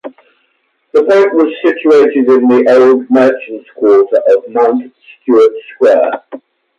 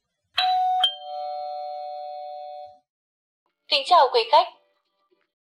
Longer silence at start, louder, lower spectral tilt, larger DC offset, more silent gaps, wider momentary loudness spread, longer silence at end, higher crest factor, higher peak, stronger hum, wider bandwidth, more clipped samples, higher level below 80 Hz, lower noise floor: second, 0.05 s vs 0.35 s; first, -9 LUFS vs -22 LUFS; first, -6 dB/octave vs 0.5 dB/octave; neither; second, none vs 2.89-3.46 s; second, 8 LU vs 19 LU; second, 0.4 s vs 1.05 s; second, 10 dB vs 20 dB; first, 0 dBFS vs -6 dBFS; neither; second, 7.6 kHz vs 13.5 kHz; neither; first, -62 dBFS vs -82 dBFS; second, -60 dBFS vs -70 dBFS